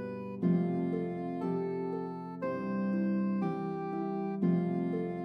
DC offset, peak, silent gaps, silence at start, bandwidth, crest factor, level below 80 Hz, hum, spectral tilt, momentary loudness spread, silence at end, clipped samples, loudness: under 0.1%; -18 dBFS; none; 0 s; 5.2 kHz; 14 dB; -78 dBFS; none; -10.5 dB/octave; 7 LU; 0 s; under 0.1%; -33 LUFS